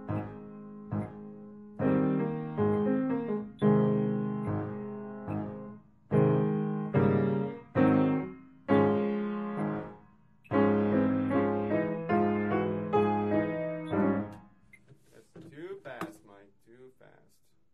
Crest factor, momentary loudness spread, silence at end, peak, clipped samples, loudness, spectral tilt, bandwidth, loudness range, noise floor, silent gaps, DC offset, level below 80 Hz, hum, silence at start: 18 dB; 17 LU; 0.85 s; -12 dBFS; under 0.1%; -30 LUFS; -10 dB/octave; 4.6 kHz; 6 LU; -70 dBFS; none; under 0.1%; -62 dBFS; none; 0 s